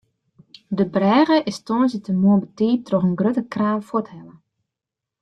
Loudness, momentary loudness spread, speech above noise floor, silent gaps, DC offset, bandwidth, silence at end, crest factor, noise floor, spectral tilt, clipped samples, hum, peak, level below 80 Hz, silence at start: -20 LUFS; 9 LU; 66 dB; none; under 0.1%; 9.6 kHz; 0.9 s; 16 dB; -86 dBFS; -7.5 dB/octave; under 0.1%; none; -4 dBFS; -62 dBFS; 0.7 s